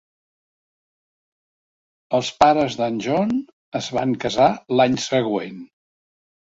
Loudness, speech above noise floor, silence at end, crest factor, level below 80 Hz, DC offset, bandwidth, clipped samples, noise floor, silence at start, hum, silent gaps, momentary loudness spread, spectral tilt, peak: -20 LUFS; over 70 dB; 0.95 s; 20 dB; -58 dBFS; under 0.1%; 7.8 kHz; under 0.1%; under -90 dBFS; 2.1 s; none; 3.53-3.72 s; 11 LU; -5 dB/octave; -2 dBFS